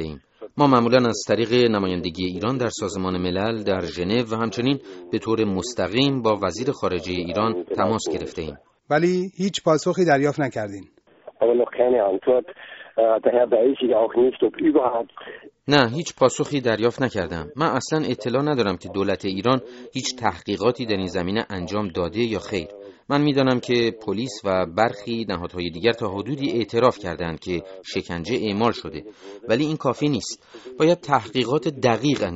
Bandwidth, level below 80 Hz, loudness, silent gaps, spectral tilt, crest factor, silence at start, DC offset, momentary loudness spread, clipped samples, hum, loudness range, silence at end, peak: 8 kHz; -54 dBFS; -22 LUFS; none; -4.5 dB/octave; 20 dB; 0 s; under 0.1%; 11 LU; under 0.1%; none; 4 LU; 0 s; -2 dBFS